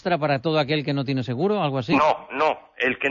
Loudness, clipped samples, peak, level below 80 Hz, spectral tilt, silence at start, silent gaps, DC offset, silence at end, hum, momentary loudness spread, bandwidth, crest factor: -23 LUFS; under 0.1%; -8 dBFS; -60 dBFS; -7 dB/octave; 0.05 s; none; under 0.1%; 0 s; none; 5 LU; 7.4 kHz; 14 dB